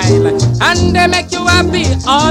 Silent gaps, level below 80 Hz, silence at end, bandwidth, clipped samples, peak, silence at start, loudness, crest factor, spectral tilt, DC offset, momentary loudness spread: none; -26 dBFS; 0 s; 14.5 kHz; 0.3%; 0 dBFS; 0 s; -11 LUFS; 10 dB; -4.5 dB/octave; under 0.1%; 3 LU